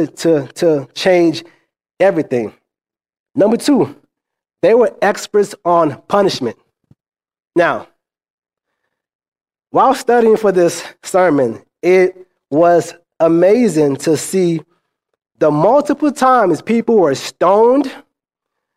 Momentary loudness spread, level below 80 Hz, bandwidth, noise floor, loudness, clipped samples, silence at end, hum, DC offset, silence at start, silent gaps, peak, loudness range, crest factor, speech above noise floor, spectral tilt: 9 LU; -60 dBFS; 15.5 kHz; -86 dBFS; -14 LUFS; under 0.1%; 0.75 s; none; under 0.1%; 0 s; 3.19-3.24 s, 8.30-8.38 s, 9.15-9.19 s, 9.28-9.32 s; 0 dBFS; 5 LU; 14 dB; 74 dB; -5.5 dB/octave